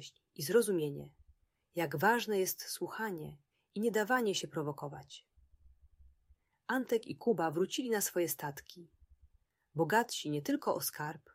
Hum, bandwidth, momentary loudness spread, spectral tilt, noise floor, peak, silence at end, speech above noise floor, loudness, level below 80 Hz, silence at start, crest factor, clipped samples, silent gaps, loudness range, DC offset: none; 16 kHz; 18 LU; -4 dB/octave; -71 dBFS; -16 dBFS; 0.15 s; 36 dB; -35 LUFS; -72 dBFS; 0 s; 20 dB; under 0.1%; none; 3 LU; under 0.1%